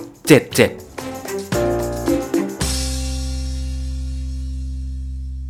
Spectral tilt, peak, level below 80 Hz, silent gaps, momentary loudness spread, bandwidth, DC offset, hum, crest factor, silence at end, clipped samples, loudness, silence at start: -5 dB/octave; 0 dBFS; -28 dBFS; none; 15 LU; 19 kHz; under 0.1%; none; 20 dB; 0 s; under 0.1%; -21 LUFS; 0 s